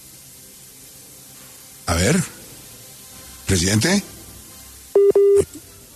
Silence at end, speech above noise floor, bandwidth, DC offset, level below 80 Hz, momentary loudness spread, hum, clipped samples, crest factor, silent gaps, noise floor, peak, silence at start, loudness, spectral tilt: 0.35 s; 25 dB; 14 kHz; under 0.1%; -46 dBFS; 24 LU; none; under 0.1%; 16 dB; none; -43 dBFS; -6 dBFS; 1.85 s; -18 LUFS; -4.5 dB/octave